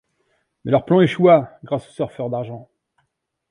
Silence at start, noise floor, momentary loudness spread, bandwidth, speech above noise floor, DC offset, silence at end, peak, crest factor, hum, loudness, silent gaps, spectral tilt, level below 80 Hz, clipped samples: 0.65 s; -73 dBFS; 18 LU; 10.5 kHz; 55 dB; under 0.1%; 0.9 s; -2 dBFS; 18 dB; none; -18 LUFS; none; -8.5 dB/octave; -60 dBFS; under 0.1%